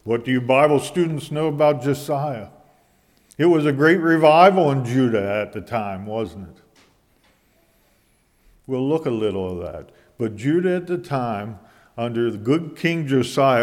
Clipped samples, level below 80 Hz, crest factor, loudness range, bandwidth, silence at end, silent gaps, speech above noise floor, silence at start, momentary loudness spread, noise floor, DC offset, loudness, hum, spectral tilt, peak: under 0.1%; -58 dBFS; 20 dB; 11 LU; 16 kHz; 0 s; none; 42 dB; 0.05 s; 14 LU; -61 dBFS; under 0.1%; -20 LUFS; none; -6.5 dB/octave; 0 dBFS